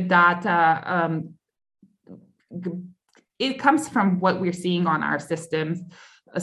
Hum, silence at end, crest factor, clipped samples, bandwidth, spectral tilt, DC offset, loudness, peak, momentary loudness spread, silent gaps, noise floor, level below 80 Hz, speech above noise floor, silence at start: none; 0 s; 20 dB; under 0.1%; 12.5 kHz; -5.5 dB/octave; under 0.1%; -23 LUFS; -4 dBFS; 15 LU; none; -49 dBFS; -70 dBFS; 26 dB; 0 s